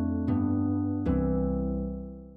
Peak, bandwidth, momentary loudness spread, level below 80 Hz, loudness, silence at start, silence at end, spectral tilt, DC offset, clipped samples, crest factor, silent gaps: -16 dBFS; 3.7 kHz; 7 LU; -38 dBFS; -29 LUFS; 0 s; 0 s; -12.5 dB/octave; under 0.1%; under 0.1%; 12 dB; none